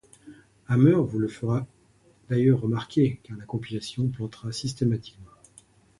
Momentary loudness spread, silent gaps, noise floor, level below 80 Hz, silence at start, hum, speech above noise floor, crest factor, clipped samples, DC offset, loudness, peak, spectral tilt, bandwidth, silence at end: 14 LU; none; -60 dBFS; -56 dBFS; 0.25 s; none; 35 dB; 20 dB; under 0.1%; under 0.1%; -26 LUFS; -6 dBFS; -7.5 dB/octave; 11.5 kHz; 0.75 s